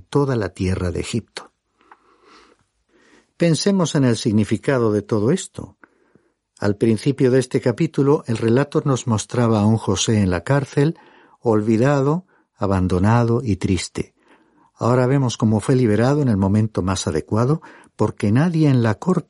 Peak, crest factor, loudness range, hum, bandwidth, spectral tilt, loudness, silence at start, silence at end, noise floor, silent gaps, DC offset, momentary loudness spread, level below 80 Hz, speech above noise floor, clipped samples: -4 dBFS; 14 dB; 3 LU; none; 11.5 kHz; -6.5 dB/octave; -19 LUFS; 0.1 s; 0.05 s; -60 dBFS; none; under 0.1%; 8 LU; -48 dBFS; 42 dB; under 0.1%